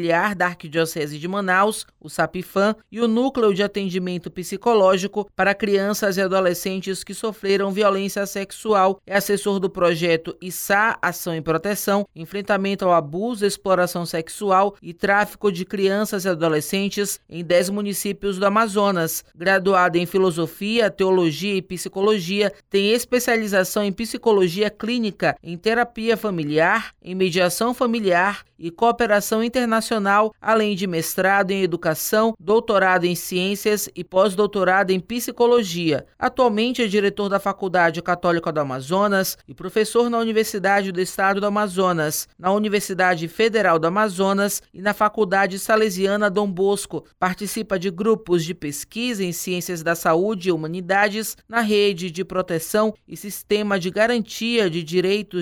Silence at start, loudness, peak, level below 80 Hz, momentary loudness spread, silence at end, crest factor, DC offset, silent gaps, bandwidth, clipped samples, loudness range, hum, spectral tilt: 0 s; -21 LUFS; -6 dBFS; -56 dBFS; 7 LU; 0 s; 14 dB; under 0.1%; none; 19.5 kHz; under 0.1%; 2 LU; none; -4.5 dB/octave